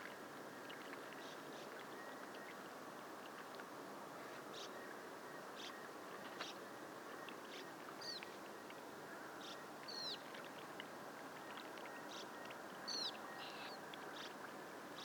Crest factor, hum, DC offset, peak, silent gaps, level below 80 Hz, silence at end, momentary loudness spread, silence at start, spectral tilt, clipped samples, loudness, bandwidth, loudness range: 20 dB; none; under 0.1%; -32 dBFS; none; under -90 dBFS; 0 s; 6 LU; 0 s; -2.5 dB/octave; under 0.1%; -51 LUFS; 19.5 kHz; 3 LU